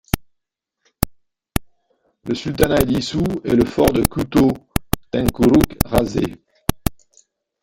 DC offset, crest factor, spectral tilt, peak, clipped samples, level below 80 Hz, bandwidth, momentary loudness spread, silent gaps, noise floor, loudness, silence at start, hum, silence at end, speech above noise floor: under 0.1%; 20 dB; -6 dB/octave; 0 dBFS; under 0.1%; -32 dBFS; 17 kHz; 12 LU; none; -77 dBFS; -19 LUFS; 0.15 s; none; 0.7 s; 60 dB